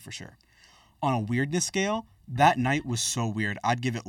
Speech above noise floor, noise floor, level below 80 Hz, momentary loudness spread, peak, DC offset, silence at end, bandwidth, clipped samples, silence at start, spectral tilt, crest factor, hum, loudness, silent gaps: 31 dB; -58 dBFS; -58 dBFS; 11 LU; -4 dBFS; under 0.1%; 0 s; 17 kHz; under 0.1%; 0 s; -4 dB/octave; 22 dB; none; -26 LUFS; none